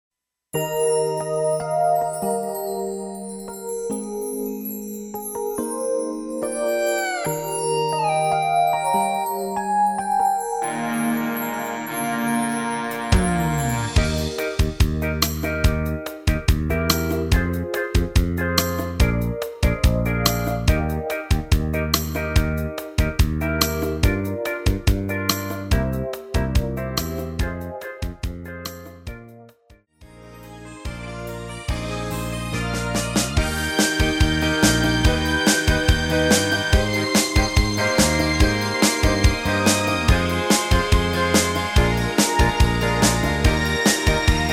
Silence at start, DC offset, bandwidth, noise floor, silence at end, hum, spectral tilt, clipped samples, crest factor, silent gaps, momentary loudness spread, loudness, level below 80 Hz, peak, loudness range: 0.55 s; under 0.1%; 17.5 kHz; -54 dBFS; 0 s; none; -4.5 dB/octave; under 0.1%; 20 dB; none; 11 LU; -21 LUFS; -28 dBFS; 0 dBFS; 10 LU